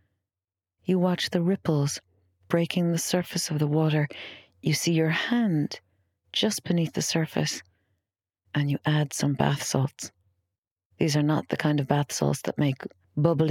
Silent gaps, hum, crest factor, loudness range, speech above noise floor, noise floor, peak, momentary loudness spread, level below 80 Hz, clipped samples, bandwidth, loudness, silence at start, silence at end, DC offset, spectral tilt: 10.58-10.63 s, 10.71-10.76 s, 10.85-10.90 s; none; 20 dB; 3 LU; over 65 dB; under -90 dBFS; -8 dBFS; 9 LU; -62 dBFS; under 0.1%; 16.5 kHz; -26 LUFS; 0.9 s; 0 s; under 0.1%; -5 dB/octave